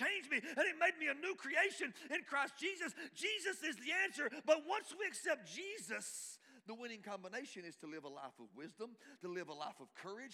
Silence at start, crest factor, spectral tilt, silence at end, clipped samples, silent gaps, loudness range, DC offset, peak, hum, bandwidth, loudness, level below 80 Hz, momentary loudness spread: 0 s; 22 dB; -2 dB/octave; 0 s; under 0.1%; none; 11 LU; under 0.1%; -20 dBFS; none; 16 kHz; -41 LUFS; under -90 dBFS; 16 LU